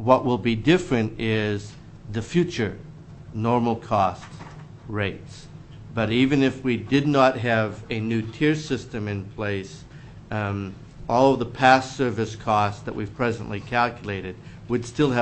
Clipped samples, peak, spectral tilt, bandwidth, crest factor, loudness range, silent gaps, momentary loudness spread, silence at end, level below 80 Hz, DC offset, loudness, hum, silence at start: under 0.1%; -2 dBFS; -6.5 dB/octave; 8.6 kHz; 22 dB; 5 LU; none; 21 LU; 0 s; -48 dBFS; under 0.1%; -24 LUFS; none; 0 s